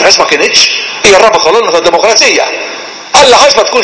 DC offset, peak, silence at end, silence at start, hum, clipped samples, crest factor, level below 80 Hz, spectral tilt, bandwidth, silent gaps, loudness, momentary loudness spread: under 0.1%; 0 dBFS; 0 s; 0 s; none; 10%; 6 dB; -40 dBFS; -0.5 dB/octave; 8 kHz; none; -5 LUFS; 9 LU